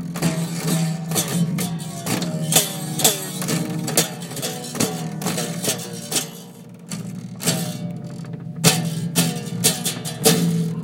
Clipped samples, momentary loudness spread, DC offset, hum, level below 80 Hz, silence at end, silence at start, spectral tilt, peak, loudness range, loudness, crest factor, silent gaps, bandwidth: under 0.1%; 14 LU; under 0.1%; none; -60 dBFS; 0 s; 0 s; -3.5 dB/octave; 0 dBFS; 5 LU; -21 LUFS; 22 dB; none; 16.5 kHz